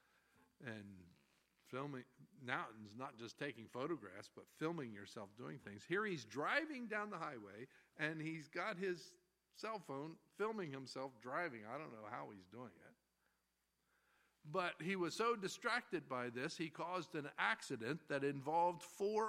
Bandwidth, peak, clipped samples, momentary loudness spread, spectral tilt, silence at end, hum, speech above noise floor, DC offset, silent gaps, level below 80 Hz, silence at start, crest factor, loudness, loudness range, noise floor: 16 kHz; -22 dBFS; under 0.1%; 15 LU; -5 dB/octave; 0 s; none; 41 dB; under 0.1%; none; -90 dBFS; 0.6 s; 24 dB; -45 LUFS; 8 LU; -86 dBFS